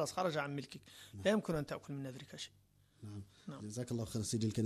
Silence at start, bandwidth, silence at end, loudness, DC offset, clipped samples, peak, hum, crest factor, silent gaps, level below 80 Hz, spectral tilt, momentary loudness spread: 0 s; 13 kHz; 0 s; -40 LUFS; under 0.1%; under 0.1%; -22 dBFS; none; 18 dB; none; -68 dBFS; -5 dB/octave; 16 LU